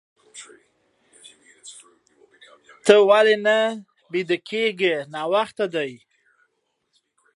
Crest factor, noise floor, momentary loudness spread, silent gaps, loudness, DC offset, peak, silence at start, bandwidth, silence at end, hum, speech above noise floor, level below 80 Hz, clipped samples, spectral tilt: 24 dB; -72 dBFS; 26 LU; none; -20 LUFS; under 0.1%; 0 dBFS; 0.35 s; 11.5 kHz; 1.4 s; none; 53 dB; -76 dBFS; under 0.1%; -4 dB/octave